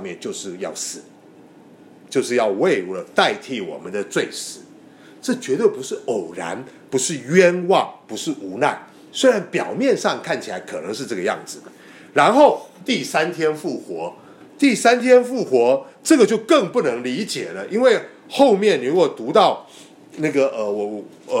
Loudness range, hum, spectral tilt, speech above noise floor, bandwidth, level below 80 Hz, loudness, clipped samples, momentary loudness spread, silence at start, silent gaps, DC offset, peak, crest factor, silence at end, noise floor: 6 LU; none; -4 dB/octave; 27 dB; 16 kHz; -72 dBFS; -19 LUFS; under 0.1%; 14 LU; 0 s; none; under 0.1%; -2 dBFS; 18 dB; 0 s; -46 dBFS